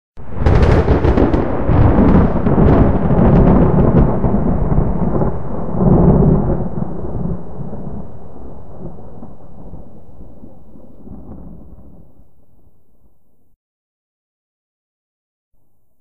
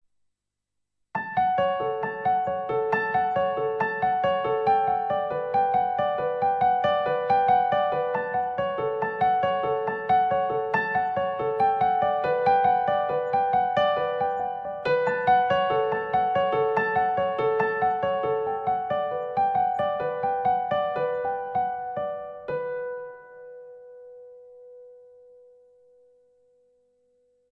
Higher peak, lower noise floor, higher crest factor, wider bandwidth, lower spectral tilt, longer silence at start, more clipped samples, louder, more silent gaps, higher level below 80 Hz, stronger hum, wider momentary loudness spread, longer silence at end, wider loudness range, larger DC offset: first, 0 dBFS vs -10 dBFS; second, -56 dBFS vs -82 dBFS; about the same, 16 dB vs 16 dB; first, 6.4 kHz vs 5.8 kHz; first, -10.5 dB/octave vs -7 dB/octave; second, 0.1 s vs 1.15 s; neither; first, -14 LUFS vs -25 LUFS; first, 13.56-15.51 s vs none; first, -22 dBFS vs -62 dBFS; neither; first, 24 LU vs 8 LU; second, 0 s vs 2.55 s; first, 23 LU vs 6 LU; first, 8% vs under 0.1%